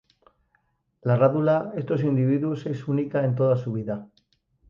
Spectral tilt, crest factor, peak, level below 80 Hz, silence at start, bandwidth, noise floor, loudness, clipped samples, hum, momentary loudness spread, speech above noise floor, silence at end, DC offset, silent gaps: -10.5 dB/octave; 18 dB; -8 dBFS; -64 dBFS; 1.05 s; 6.8 kHz; -70 dBFS; -24 LUFS; under 0.1%; none; 10 LU; 47 dB; 0.65 s; under 0.1%; none